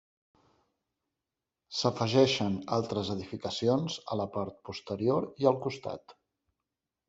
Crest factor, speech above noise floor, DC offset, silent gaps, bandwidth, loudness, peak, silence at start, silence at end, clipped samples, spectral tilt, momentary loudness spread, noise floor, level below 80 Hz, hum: 22 dB; 59 dB; under 0.1%; none; 8 kHz; -31 LUFS; -10 dBFS; 1.7 s; 0.95 s; under 0.1%; -5.5 dB/octave; 13 LU; -89 dBFS; -70 dBFS; none